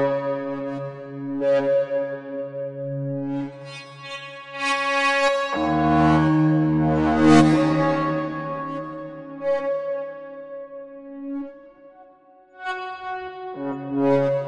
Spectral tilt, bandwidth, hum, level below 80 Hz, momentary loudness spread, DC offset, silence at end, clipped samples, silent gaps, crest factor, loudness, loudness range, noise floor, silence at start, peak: -6.5 dB/octave; 11 kHz; none; -50 dBFS; 18 LU; under 0.1%; 0 s; under 0.1%; none; 20 dB; -22 LUFS; 15 LU; -52 dBFS; 0 s; -2 dBFS